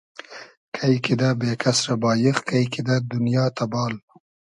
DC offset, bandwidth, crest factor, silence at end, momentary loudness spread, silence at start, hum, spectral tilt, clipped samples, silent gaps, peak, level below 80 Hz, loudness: under 0.1%; 11.5 kHz; 20 dB; 0.6 s; 16 LU; 0.3 s; none; -5.5 dB/octave; under 0.1%; 0.57-0.72 s; -4 dBFS; -60 dBFS; -22 LUFS